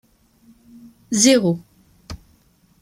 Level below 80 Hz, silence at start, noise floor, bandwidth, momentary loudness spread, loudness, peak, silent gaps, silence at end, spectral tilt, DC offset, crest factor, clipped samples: -52 dBFS; 1.1 s; -57 dBFS; 15.5 kHz; 25 LU; -17 LUFS; -2 dBFS; none; 0.65 s; -3.5 dB/octave; under 0.1%; 20 dB; under 0.1%